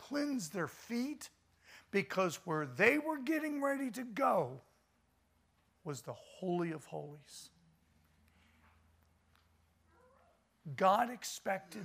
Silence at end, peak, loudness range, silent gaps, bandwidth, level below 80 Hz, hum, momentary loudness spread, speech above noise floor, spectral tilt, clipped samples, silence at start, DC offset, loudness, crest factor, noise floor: 0 s; -14 dBFS; 11 LU; none; 15.5 kHz; -78 dBFS; none; 20 LU; 38 dB; -5 dB/octave; under 0.1%; 0 s; under 0.1%; -36 LUFS; 24 dB; -75 dBFS